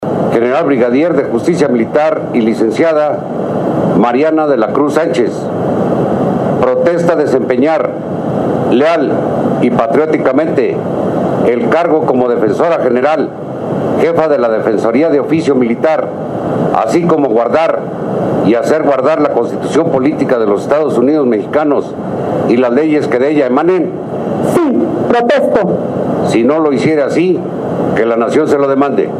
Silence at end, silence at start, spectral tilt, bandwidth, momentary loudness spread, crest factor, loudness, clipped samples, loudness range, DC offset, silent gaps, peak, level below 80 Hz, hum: 0 s; 0 s; -7.5 dB/octave; 13.5 kHz; 5 LU; 12 dB; -12 LUFS; under 0.1%; 1 LU; under 0.1%; none; 0 dBFS; -50 dBFS; none